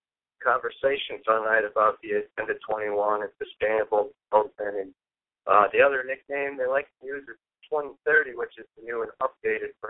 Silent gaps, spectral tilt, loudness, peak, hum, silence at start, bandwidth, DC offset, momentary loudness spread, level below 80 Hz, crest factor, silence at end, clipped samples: none; -7.5 dB/octave; -26 LUFS; -4 dBFS; none; 0.4 s; 4 kHz; under 0.1%; 14 LU; -66 dBFS; 22 dB; 0 s; under 0.1%